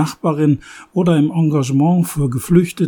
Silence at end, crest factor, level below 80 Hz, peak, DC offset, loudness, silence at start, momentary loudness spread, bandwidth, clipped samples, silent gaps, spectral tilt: 0 s; 16 dB; -44 dBFS; 0 dBFS; under 0.1%; -16 LUFS; 0 s; 5 LU; 19 kHz; under 0.1%; none; -7.5 dB/octave